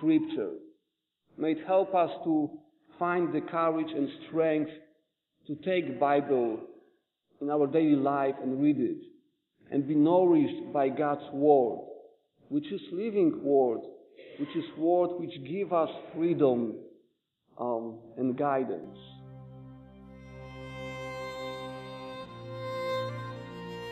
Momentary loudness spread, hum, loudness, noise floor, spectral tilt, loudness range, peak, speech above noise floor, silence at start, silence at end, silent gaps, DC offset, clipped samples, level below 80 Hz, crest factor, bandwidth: 17 LU; none; -29 LUFS; -82 dBFS; -8.5 dB/octave; 11 LU; -12 dBFS; 54 dB; 0 s; 0 s; none; under 0.1%; under 0.1%; -68 dBFS; 20 dB; 7.8 kHz